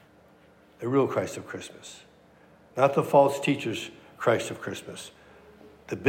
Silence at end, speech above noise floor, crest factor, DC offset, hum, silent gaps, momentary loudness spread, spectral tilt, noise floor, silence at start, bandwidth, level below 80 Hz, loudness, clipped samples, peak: 0 s; 31 dB; 22 dB; under 0.1%; none; none; 21 LU; -5.5 dB/octave; -57 dBFS; 0.8 s; 16 kHz; -70 dBFS; -26 LUFS; under 0.1%; -6 dBFS